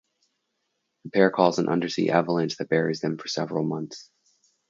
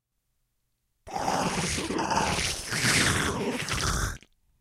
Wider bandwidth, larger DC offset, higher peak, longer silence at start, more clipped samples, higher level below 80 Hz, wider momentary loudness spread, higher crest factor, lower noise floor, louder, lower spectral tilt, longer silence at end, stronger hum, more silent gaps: second, 7.6 kHz vs 16 kHz; neither; first, -4 dBFS vs -10 dBFS; about the same, 1.05 s vs 1.05 s; neither; second, -70 dBFS vs -42 dBFS; about the same, 9 LU vs 10 LU; about the same, 22 dB vs 20 dB; about the same, -77 dBFS vs -77 dBFS; about the same, -25 LUFS vs -27 LUFS; first, -5.5 dB/octave vs -3 dB/octave; first, 0.65 s vs 0.45 s; neither; neither